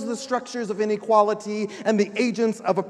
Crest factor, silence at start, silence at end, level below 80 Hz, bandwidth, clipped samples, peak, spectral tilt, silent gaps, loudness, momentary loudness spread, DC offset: 18 dB; 0 s; 0 s; -76 dBFS; 11.5 kHz; under 0.1%; -6 dBFS; -5 dB/octave; none; -23 LUFS; 8 LU; under 0.1%